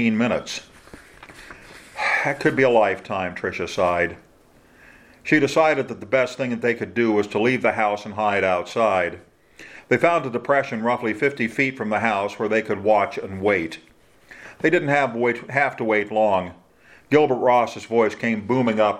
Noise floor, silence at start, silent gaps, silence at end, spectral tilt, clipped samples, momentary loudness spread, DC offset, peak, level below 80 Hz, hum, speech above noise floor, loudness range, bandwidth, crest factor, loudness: -54 dBFS; 0 s; none; 0 s; -5.5 dB/octave; under 0.1%; 9 LU; under 0.1%; -2 dBFS; -60 dBFS; none; 33 dB; 2 LU; 14 kHz; 20 dB; -21 LUFS